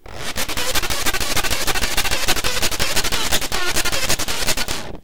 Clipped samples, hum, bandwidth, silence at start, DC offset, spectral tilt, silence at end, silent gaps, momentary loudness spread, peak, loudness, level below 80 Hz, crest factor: under 0.1%; none; 19 kHz; 0 s; 9%; -1.5 dB/octave; 0 s; none; 3 LU; 0 dBFS; -20 LUFS; -32 dBFS; 20 dB